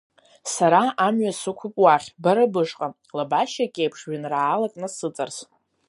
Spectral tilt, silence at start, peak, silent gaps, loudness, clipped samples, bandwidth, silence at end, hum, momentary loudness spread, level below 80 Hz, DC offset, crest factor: -4.5 dB/octave; 0.45 s; -4 dBFS; none; -22 LUFS; under 0.1%; 11.5 kHz; 0.45 s; none; 13 LU; -76 dBFS; under 0.1%; 20 dB